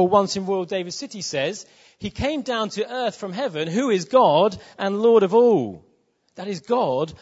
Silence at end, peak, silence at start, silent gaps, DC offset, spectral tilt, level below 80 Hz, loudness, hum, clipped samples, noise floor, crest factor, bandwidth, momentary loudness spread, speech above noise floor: 0.05 s; -2 dBFS; 0 s; none; under 0.1%; -5 dB/octave; -54 dBFS; -21 LUFS; none; under 0.1%; -64 dBFS; 18 dB; 8 kHz; 15 LU; 43 dB